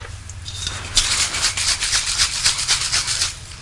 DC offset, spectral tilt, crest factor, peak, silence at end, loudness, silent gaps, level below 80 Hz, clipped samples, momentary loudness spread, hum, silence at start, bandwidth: under 0.1%; 0.5 dB/octave; 20 dB; 0 dBFS; 0 s; -18 LUFS; none; -36 dBFS; under 0.1%; 11 LU; none; 0 s; 11.5 kHz